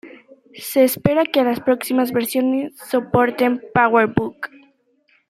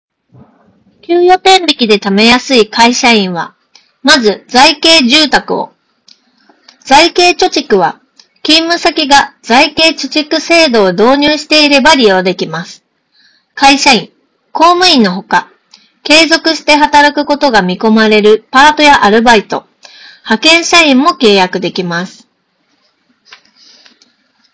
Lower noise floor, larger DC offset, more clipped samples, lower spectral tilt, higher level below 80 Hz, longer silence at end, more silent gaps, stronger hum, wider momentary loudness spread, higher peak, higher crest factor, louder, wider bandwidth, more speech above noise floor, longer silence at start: about the same, -61 dBFS vs -58 dBFS; neither; second, under 0.1% vs 5%; first, -5.5 dB/octave vs -3 dB/octave; second, -54 dBFS vs -44 dBFS; second, 0.85 s vs 2.45 s; neither; neither; second, 8 LU vs 11 LU; about the same, -2 dBFS vs 0 dBFS; first, 18 dB vs 10 dB; second, -18 LUFS vs -7 LUFS; first, 16 kHz vs 8 kHz; second, 43 dB vs 51 dB; second, 0.05 s vs 1.1 s